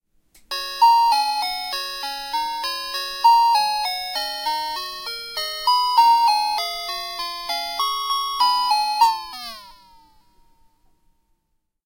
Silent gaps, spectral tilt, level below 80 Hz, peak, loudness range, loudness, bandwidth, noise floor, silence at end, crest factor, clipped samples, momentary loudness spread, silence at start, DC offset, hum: none; 1 dB/octave; -58 dBFS; -6 dBFS; 3 LU; -20 LUFS; 16.5 kHz; -72 dBFS; 2.15 s; 16 dB; under 0.1%; 13 LU; 0.5 s; under 0.1%; none